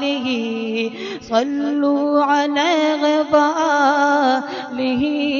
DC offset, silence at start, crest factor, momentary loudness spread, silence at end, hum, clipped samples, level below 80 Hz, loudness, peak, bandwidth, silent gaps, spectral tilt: under 0.1%; 0 s; 16 dB; 7 LU; 0 s; none; under 0.1%; -58 dBFS; -18 LUFS; -2 dBFS; 7.2 kHz; none; -4 dB/octave